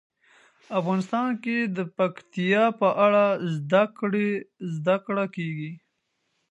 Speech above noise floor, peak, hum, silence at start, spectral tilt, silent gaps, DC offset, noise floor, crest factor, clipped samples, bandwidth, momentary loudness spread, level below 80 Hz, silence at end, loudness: 51 dB; -6 dBFS; none; 0.7 s; -7.5 dB/octave; none; under 0.1%; -75 dBFS; 18 dB; under 0.1%; 8.6 kHz; 11 LU; -76 dBFS; 0.75 s; -25 LUFS